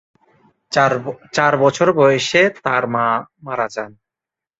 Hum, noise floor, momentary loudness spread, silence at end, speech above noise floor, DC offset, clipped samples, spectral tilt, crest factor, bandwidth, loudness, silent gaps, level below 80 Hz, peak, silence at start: none; -87 dBFS; 10 LU; 0.7 s; 71 dB; under 0.1%; under 0.1%; -4.5 dB/octave; 16 dB; 8 kHz; -17 LUFS; none; -62 dBFS; -2 dBFS; 0.7 s